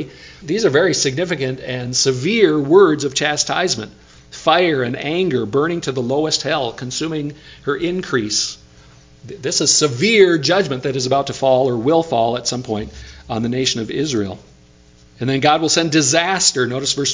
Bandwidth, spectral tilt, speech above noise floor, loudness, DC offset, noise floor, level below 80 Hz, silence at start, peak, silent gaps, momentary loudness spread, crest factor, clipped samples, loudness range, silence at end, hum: 7.8 kHz; -3.5 dB/octave; 30 dB; -17 LUFS; under 0.1%; -48 dBFS; -48 dBFS; 0 s; 0 dBFS; none; 13 LU; 18 dB; under 0.1%; 5 LU; 0 s; none